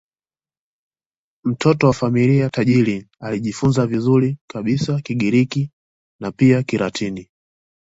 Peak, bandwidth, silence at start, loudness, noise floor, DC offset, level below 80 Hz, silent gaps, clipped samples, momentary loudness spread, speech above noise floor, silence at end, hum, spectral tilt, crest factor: -2 dBFS; 8 kHz; 1.45 s; -18 LUFS; under -90 dBFS; under 0.1%; -52 dBFS; 4.41-4.48 s, 5.73-6.19 s; under 0.1%; 11 LU; over 73 dB; 0.6 s; none; -7 dB/octave; 18 dB